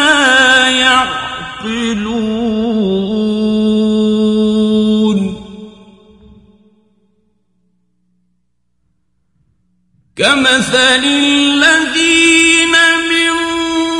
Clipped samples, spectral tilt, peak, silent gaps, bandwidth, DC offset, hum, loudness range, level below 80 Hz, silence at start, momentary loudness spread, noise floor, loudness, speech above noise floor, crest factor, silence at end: under 0.1%; -3 dB/octave; 0 dBFS; none; 11.5 kHz; under 0.1%; 60 Hz at -55 dBFS; 10 LU; -46 dBFS; 0 s; 10 LU; -67 dBFS; -10 LUFS; 56 dB; 14 dB; 0 s